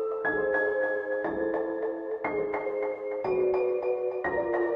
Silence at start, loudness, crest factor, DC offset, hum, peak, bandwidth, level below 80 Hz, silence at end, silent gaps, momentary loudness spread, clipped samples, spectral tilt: 0 s; -29 LUFS; 14 dB; under 0.1%; none; -16 dBFS; 5.2 kHz; -62 dBFS; 0 s; none; 6 LU; under 0.1%; -8.5 dB/octave